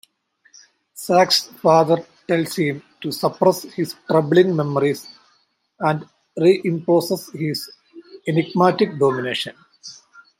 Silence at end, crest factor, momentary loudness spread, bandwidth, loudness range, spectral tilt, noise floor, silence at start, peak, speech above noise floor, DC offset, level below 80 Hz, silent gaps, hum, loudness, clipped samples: 0.45 s; 18 dB; 14 LU; 16.5 kHz; 3 LU; -5.5 dB/octave; -63 dBFS; 0.95 s; -2 dBFS; 45 dB; under 0.1%; -68 dBFS; none; none; -19 LUFS; under 0.1%